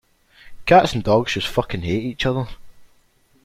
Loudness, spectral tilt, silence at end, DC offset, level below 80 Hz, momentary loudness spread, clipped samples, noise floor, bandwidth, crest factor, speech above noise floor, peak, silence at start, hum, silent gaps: -19 LUFS; -5.5 dB/octave; 0.6 s; under 0.1%; -42 dBFS; 12 LU; under 0.1%; -58 dBFS; 15.5 kHz; 20 dB; 40 dB; -2 dBFS; 0.45 s; none; none